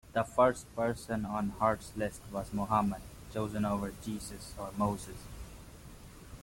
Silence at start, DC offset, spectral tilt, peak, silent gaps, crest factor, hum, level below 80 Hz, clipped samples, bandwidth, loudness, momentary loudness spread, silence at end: 0.05 s; under 0.1%; -6 dB/octave; -14 dBFS; none; 22 dB; none; -52 dBFS; under 0.1%; 16.5 kHz; -34 LUFS; 21 LU; 0 s